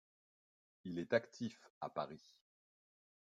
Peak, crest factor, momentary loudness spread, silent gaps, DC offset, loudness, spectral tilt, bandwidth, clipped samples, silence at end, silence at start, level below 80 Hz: -20 dBFS; 26 dB; 14 LU; 1.70-1.81 s; under 0.1%; -43 LUFS; -6 dB/octave; 7.8 kHz; under 0.1%; 1.15 s; 0.85 s; -86 dBFS